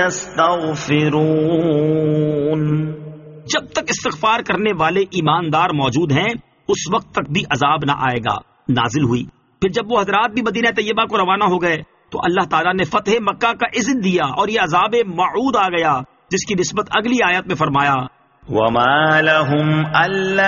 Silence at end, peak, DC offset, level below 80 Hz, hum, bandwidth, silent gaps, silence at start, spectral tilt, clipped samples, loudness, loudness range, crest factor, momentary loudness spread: 0 s; 0 dBFS; under 0.1%; -50 dBFS; none; 7.4 kHz; none; 0 s; -4 dB/octave; under 0.1%; -17 LUFS; 3 LU; 16 dB; 6 LU